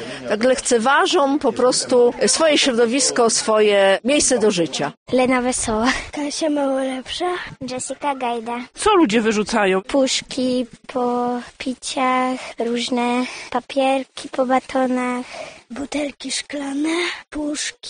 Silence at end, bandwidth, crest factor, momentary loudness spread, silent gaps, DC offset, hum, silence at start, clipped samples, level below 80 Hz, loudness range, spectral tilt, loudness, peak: 0 s; 10 kHz; 16 dB; 11 LU; 4.97-5.06 s; under 0.1%; none; 0 s; under 0.1%; -50 dBFS; 7 LU; -2.5 dB/octave; -19 LUFS; -4 dBFS